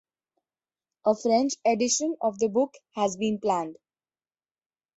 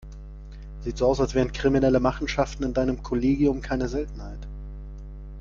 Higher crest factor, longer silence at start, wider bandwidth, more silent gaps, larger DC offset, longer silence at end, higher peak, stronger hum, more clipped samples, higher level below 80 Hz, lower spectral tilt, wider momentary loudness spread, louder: about the same, 18 dB vs 18 dB; first, 1.05 s vs 0 s; first, 8.2 kHz vs 7.4 kHz; neither; neither; first, 1.25 s vs 0 s; second, -10 dBFS vs -6 dBFS; neither; neither; second, -70 dBFS vs -36 dBFS; second, -3.5 dB/octave vs -6.5 dB/octave; second, 6 LU vs 20 LU; about the same, -26 LUFS vs -25 LUFS